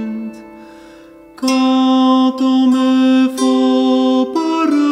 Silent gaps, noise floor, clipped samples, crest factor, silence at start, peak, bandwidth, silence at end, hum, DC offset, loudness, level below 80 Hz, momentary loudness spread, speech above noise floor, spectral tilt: none; -40 dBFS; under 0.1%; 12 dB; 0 s; -2 dBFS; 11.5 kHz; 0 s; none; under 0.1%; -13 LUFS; -62 dBFS; 7 LU; 27 dB; -4 dB/octave